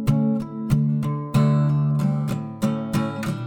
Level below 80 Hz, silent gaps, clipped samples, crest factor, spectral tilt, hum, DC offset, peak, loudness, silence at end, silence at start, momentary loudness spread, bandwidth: -44 dBFS; none; under 0.1%; 16 dB; -8 dB/octave; none; under 0.1%; -6 dBFS; -22 LUFS; 0 s; 0 s; 6 LU; 16.5 kHz